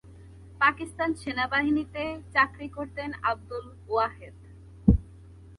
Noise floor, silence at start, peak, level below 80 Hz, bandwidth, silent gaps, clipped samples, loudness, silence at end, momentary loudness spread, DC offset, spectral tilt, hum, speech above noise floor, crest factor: -49 dBFS; 0.05 s; -4 dBFS; -40 dBFS; 11.5 kHz; none; under 0.1%; -27 LUFS; 0.05 s; 13 LU; under 0.1%; -7 dB/octave; none; 20 dB; 24 dB